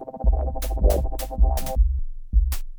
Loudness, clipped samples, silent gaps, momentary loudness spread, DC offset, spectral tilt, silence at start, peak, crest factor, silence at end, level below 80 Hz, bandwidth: -25 LUFS; under 0.1%; none; 5 LU; under 0.1%; -6.5 dB/octave; 0 s; -6 dBFS; 16 dB; 0 s; -22 dBFS; over 20 kHz